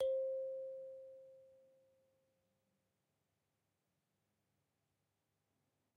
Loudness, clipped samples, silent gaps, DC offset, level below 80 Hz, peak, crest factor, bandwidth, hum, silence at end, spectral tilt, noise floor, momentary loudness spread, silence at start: -44 LUFS; under 0.1%; none; under 0.1%; -90 dBFS; -30 dBFS; 18 dB; 3.8 kHz; none; 4.4 s; -3.5 dB/octave; -87 dBFS; 22 LU; 0 s